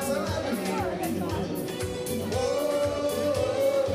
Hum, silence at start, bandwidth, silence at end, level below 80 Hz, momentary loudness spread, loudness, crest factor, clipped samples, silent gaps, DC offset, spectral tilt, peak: none; 0 s; 16 kHz; 0 s; -50 dBFS; 6 LU; -28 LUFS; 14 dB; under 0.1%; none; under 0.1%; -5 dB/octave; -14 dBFS